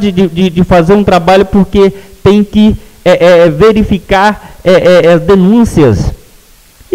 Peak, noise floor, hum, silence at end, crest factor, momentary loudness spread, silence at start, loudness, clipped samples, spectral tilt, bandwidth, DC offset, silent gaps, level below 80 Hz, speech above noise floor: 0 dBFS; -39 dBFS; none; 0.8 s; 6 dB; 6 LU; 0 s; -7 LUFS; 0.7%; -7 dB/octave; 15.5 kHz; under 0.1%; none; -26 dBFS; 34 dB